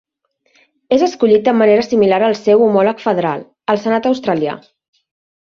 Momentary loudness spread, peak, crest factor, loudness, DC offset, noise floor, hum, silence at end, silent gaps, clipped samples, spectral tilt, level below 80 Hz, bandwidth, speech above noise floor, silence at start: 8 LU; -2 dBFS; 14 dB; -14 LUFS; under 0.1%; -63 dBFS; none; 0.85 s; none; under 0.1%; -6.5 dB/octave; -58 dBFS; 7 kHz; 50 dB; 0.9 s